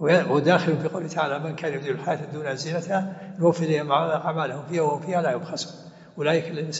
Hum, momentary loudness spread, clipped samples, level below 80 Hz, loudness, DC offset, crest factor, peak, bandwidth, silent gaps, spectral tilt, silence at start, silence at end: none; 10 LU; under 0.1%; -72 dBFS; -25 LUFS; under 0.1%; 18 dB; -6 dBFS; 8 kHz; none; -5 dB/octave; 0 s; 0 s